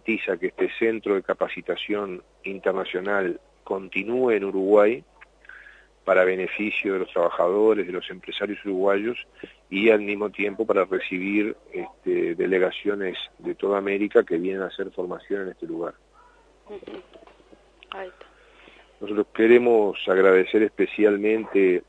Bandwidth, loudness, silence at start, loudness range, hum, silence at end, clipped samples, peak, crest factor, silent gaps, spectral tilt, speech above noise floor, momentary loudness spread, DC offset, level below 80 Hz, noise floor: 8 kHz; -23 LUFS; 0.05 s; 12 LU; none; 0.1 s; under 0.1%; -4 dBFS; 20 dB; none; -7 dB/octave; 32 dB; 16 LU; under 0.1%; -62 dBFS; -55 dBFS